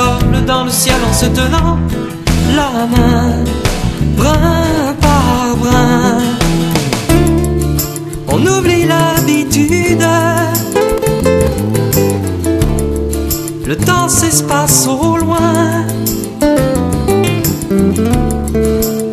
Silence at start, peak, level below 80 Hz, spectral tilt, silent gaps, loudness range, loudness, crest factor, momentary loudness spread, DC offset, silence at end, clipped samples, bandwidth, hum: 0 s; 0 dBFS; -22 dBFS; -5 dB/octave; none; 2 LU; -12 LUFS; 12 dB; 5 LU; under 0.1%; 0 s; under 0.1%; 14.5 kHz; none